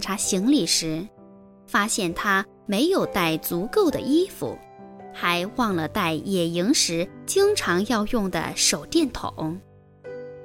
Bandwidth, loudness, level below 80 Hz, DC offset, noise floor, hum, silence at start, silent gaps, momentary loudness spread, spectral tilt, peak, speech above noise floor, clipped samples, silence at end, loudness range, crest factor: 17 kHz; -23 LUFS; -48 dBFS; under 0.1%; -48 dBFS; none; 0 s; none; 13 LU; -3.5 dB/octave; -6 dBFS; 25 dB; under 0.1%; 0 s; 2 LU; 18 dB